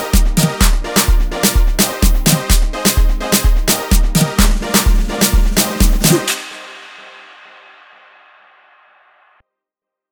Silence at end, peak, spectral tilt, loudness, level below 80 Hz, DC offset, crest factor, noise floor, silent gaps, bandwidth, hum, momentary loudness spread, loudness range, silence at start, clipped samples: 2.9 s; 0 dBFS; -3.5 dB/octave; -14 LUFS; -16 dBFS; under 0.1%; 14 dB; -84 dBFS; none; over 20 kHz; none; 7 LU; 6 LU; 0 s; under 0.1%